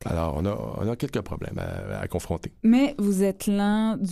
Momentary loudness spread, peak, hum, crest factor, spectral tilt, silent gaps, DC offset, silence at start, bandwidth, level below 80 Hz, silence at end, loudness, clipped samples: 12 LU; -10 dBFS; none; 14 dB; -6.5 dB/octave; none; under 0.1%; 0 s; 14.5 kHz; -44 dBFS; 0 s; -26 LUFS; under 0.1%